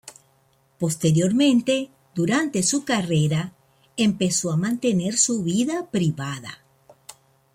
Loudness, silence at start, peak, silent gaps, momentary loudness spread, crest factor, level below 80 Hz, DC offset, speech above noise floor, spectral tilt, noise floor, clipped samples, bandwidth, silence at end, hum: -22 LUFS; 0.05 s; -6 dBFS; none; 12 LU; 16 dB; -60 dBFS; under 0.1%; 41 dB; -4.5 dB/octave; -62 dBFS; under 0.1%; 16 kHz; 0.4 s; none